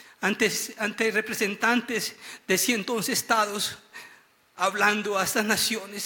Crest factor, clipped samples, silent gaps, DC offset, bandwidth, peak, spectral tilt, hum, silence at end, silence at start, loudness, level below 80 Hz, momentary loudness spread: 18 dB; under 0.1%; none; under 0.1%; 17.5 kHz; -8 dBFS; -2 dB/octave; none; 0 s; 0 s; -25 LUFS; -68 dBFS; 7 LU